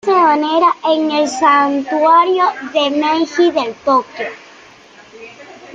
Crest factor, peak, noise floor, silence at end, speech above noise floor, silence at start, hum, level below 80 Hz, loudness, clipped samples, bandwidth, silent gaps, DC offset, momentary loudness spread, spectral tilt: 14 dB; 0 dBFS; -42 dBFS; 0 s; 28 dB; 0.05 s; none; -62 dBFS; -13 LUFS; under 0.1%; 9.2 kHz; none; under 0.1%; 6 LU; -3 dB/octave